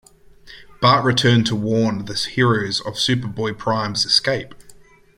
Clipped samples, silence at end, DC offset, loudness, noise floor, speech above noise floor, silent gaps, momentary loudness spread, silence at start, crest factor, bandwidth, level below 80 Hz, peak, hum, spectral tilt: under 0.1%; 0.45 s; under 0.1%; -18 LUFS; -46 dBFS; 28 dB; none; 8 LU; 0.45 s; 18 dB; 14.5 kHz; -50 dBFS; -2 dBFS; none; -4.5 dB/octave